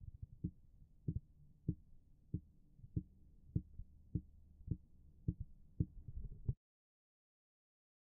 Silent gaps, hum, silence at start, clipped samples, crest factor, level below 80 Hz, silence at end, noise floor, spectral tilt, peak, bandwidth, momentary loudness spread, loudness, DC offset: none; none; 0 s; under 0.1%; 26 dB; -56 dBFS; 1.65 s; -64 dBFS; -18.5 dB/octave; -24 dBFS; 1 kHz; 19 LU; -49 LUFS; under 0.1%